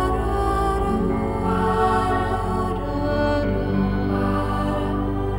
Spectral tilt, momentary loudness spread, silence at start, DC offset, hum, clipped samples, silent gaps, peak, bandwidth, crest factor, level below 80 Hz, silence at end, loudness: -7.5 dB/octave; 4 LU; 0 s; 0.3%; none; under 0.1%; none; -8 dBFS; 16.5 kHz; 14 dB; -30 dBFS; 0 s; -22 LUFS